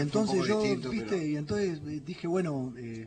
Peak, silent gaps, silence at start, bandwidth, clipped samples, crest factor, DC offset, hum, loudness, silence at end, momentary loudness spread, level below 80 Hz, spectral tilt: -16 dBFS; none; 0 s; 9.6 kHz; under 0.1%; 16 dB; under 0.1%; none; -31 LUFS; 0 s; 10 LU; -60 dBFS; -6 dB/octave